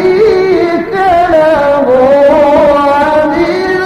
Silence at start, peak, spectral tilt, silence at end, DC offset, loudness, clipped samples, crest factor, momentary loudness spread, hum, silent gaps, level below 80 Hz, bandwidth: 0 s; 0 dBFS; -6 dB/octave; 0 s; under 0.1%; -8 LUFS; under 0.1%; 8 dB; 5 LU; none; none; -36 dBFS; 12 kHz